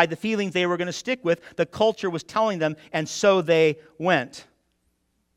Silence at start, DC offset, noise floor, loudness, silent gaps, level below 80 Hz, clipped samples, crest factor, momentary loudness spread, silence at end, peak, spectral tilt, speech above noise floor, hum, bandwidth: 0 s; under 0.1%; -71 dBFS; -23 LUFS; none; -66 dBFS; under 0.1%; 22 dB; 8 LU; 0.95 s; -2 dBFS; -4.5 dB/octave; 48 dB; none; 14 kHz